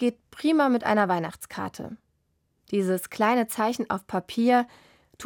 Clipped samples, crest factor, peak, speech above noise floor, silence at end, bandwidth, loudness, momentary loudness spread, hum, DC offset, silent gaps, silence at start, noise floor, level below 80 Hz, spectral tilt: under 0.1%; 16 dB; -10 dBFS; 47 dB; 0 s; 17.5 kHz; -25 LUFS; 13 LU; none; under 0.1%; none; 0 s; -72 dBFS; -66 dBFS; -5.5 dB/octave